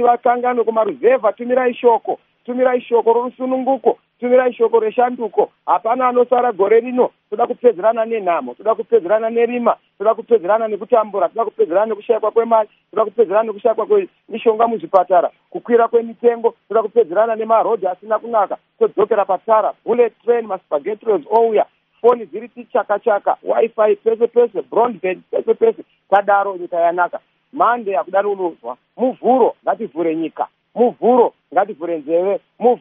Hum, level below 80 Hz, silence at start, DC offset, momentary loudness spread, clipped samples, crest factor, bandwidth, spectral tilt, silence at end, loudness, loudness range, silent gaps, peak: none; -74 dBFS; 0 s; under 0.1%; 7 LU; under 0.1%; 16 dB; 3.7 kHz; -4 dB/octave; 0 s; -17 LUFS; 2 LU; none; 0 dBFS